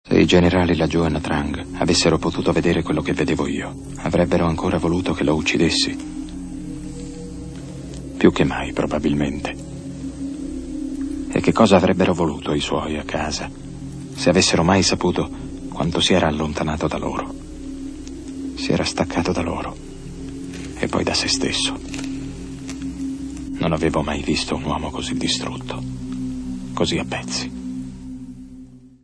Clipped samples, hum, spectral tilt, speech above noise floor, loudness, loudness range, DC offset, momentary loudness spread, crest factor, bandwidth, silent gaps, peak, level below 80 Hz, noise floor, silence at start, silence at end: under 0.1%; none; -5 dB/octave; 22 dB; -21 LUFS; 5 LU; under 0.1%; 17 LU; 22 dB; 11 kHz; none; 0 dBFS; -38 dBFS; -41 dBFS; 0.05 s; 0.15 s